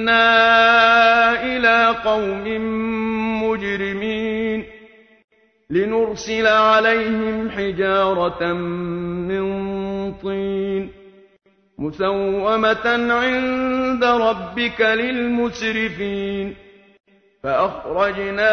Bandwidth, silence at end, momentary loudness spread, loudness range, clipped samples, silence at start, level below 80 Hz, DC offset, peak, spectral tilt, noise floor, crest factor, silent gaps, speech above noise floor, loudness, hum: 6.6 kHz; 0 s; 13 LU; 7 LU; under 0.1%; 0 s; -48 dBFS; under 0.1%; -2 dBFS; -5 dB/octave; -47 dBFS; 18 dB; 5.24-5.28 s, 17.00-17.04 s; 28 dB; -18 LUFS; none